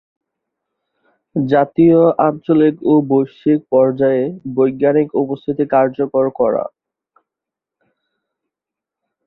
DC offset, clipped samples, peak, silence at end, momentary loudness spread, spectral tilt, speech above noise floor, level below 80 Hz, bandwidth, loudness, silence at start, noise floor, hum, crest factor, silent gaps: under 0.1%; under 0.1%; -2 dBFS; 2.6 s; 9 LU; -11 dB/octave; 71 dB; -58 dBFS; 4.2 kHz; -15 LUFS; 1.35 s; -85 dBFS; none; 16 dB; none